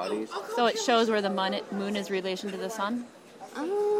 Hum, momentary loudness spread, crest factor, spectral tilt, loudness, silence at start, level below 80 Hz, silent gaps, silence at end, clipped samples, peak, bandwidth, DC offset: none; 12 LU; 20 dB; -4 dB/octave; -29 LUFS; 0 s; -76 dBFS; none; 0 s; under 0.1%; -10 dBFS; 16 kHz; under 0.1%